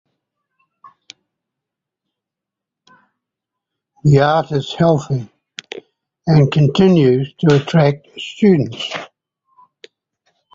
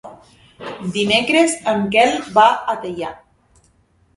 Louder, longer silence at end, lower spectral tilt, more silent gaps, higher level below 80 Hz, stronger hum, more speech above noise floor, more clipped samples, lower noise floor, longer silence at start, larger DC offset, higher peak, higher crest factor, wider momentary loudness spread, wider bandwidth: about the same, -15 LUFS vs -16 LUFS; first, 1.5 s vs 1 s; first, -7.5 dB/octave vs -3.5 dB/octave; neither; about the same, -52 dBFS vs -56 dBFS; neither; first, 70 dB vs 41 dB; neither; first, -84 dBFS vs -58 dBFS; first, 4.05 s vs 0.05 s; neither; about the same, -2 dBFS vs 0 dBFS; about the same, 16 dB vs 18 dB; first, 19 LU vs 15 LU; second, 7.6 kHz vs 11.5 kHz